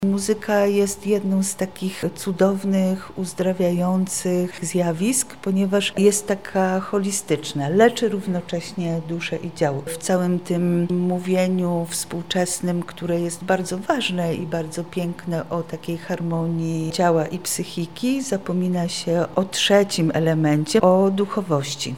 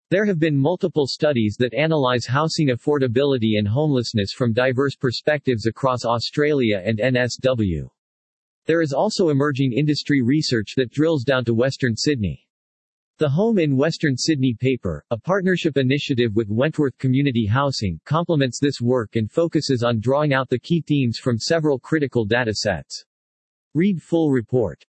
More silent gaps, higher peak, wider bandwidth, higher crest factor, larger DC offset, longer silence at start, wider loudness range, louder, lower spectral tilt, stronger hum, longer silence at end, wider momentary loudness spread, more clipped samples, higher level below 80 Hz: second, none vs 7.98-8.62 s, 12.50-13.14 s, 23.06-23.71 s; about the same, -2 dBFS vs -4 dBFS; first, 17 kHz vs 8.8 kHz; about the same, 20 dB vs 16 dB; first, 0.5% vs under 0.1%; about the same, 0 s vs 0.1 s; about the same, 4 LU vs 2 LU; about the same, -22 LUFS vs -20 LUFS; about the same, -5 dB/octave vs -6 dB/octave; neither; second, 0 s vs 0.15 s; first, 9 LU vs 4 LU; neither; about the same, -58 dBFS vs -54 dBFS